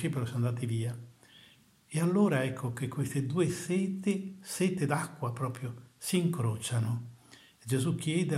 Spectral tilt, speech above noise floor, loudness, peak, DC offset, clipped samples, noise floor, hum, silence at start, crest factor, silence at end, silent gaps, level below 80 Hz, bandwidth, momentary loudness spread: -6 dB/octave; 30 dB; -32 LUFS; -14 dBFS; under 0.1%; under 0.1%; -61 dBFS; none; 0 s; 18 dB; 0 s; none; -72 dBFS; 15.5 kHz; 10 LU